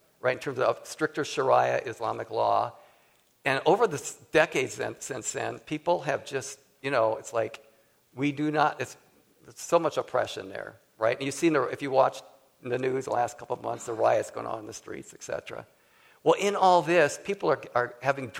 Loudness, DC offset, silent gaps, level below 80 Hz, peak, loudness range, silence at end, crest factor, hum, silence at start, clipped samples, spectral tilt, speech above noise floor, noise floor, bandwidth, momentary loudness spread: -28 LUFS; under 0.1%; none; -70 dBFS; -6 dBFS; 4 LU; 0 s; 22 dB; none; 0.25 s; under 0.1%; -4.5 dB/octave; 37 dB; -64 dBFS; 16.5 kHz; 13 LU